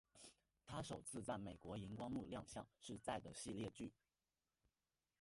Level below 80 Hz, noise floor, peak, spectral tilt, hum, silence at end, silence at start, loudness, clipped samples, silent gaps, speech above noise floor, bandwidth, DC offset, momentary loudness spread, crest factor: -72 dBFS; under -90 dBFS; -34 dBFS; -5 dB/octave; none; 1.3 s; 0.15 s; -52 LUFS; under 0.1%; none; over 39 dB; 11.5 kHz; under 0.1%; 9 LU; 20 dB